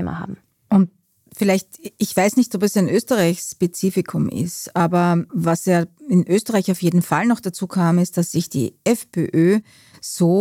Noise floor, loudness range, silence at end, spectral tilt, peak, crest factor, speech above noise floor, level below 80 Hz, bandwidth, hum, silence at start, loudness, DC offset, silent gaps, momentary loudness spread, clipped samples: -38 dBFS; 1 LU; 0 s; -6 dB/octave; -4 dBFS; 14 dB; 19 dB; -58 dBFS; 16.5 kHz; none; 0 s; -19 LUFS; under 0.1%; none; 7 LU; under 0.1%